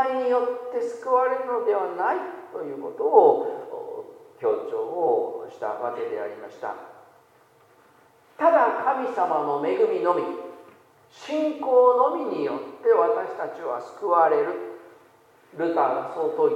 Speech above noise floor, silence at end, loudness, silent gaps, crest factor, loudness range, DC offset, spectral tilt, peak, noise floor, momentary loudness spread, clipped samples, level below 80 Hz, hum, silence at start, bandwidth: 34 dB; 0 s; -24 LUFS; none; 22 dB; 6 LU; under 0.1%; -6 dB/octave; -2 dBFS; -57 dBFS; 16 LU; under 0.1%; -84 dBFS; none; 0 s; 8.4 kHz